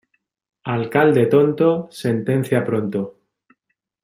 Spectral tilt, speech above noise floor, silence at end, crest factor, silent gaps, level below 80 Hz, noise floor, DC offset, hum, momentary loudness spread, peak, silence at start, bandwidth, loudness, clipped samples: -7.5 dB/octave; 57 dB; 0.95 s; 18 dB; none; -62 dBFS; -75 dBFS; under 0.1%; none; 11 LU; -2 dBFS; 0.65 s; 15.5 kHz; -19 LUFS; under 0.1%